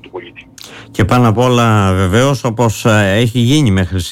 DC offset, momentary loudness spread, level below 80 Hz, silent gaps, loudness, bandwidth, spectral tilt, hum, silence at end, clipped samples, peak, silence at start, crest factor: under 0.1%; 16 LU; -36 dBFS; none; -12 LUFS; 16 kHz; -6 dB/octave; none; 0 s; under 0.1%; -2 dBFS; 0.15 s; 10 dB